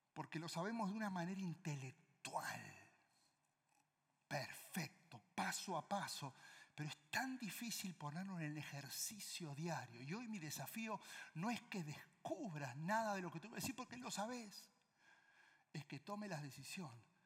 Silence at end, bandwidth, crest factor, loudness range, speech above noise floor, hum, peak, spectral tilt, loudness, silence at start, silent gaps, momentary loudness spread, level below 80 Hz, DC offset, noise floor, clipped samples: 0.2 s; 16.5 kHz; 20 dB; 5 LU; 37 dB; none; -28 dBFS; -4 dB/octave; -48 LUFS; 0.15 s; none; 9 LU; under -90 dBFS; under 0.1%; -85 dBFS; under 0.1%